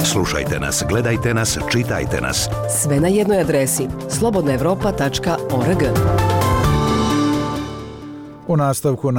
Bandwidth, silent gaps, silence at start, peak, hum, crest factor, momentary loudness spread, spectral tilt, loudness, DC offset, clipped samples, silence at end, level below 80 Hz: 18.5 kHz; none; 0 s; -8 dBFS; none; 10 dB; 6 LU; -5 dB/octave; -18 LUFS; under 0.1%; under 0.1%; 0 s; -32 dBFS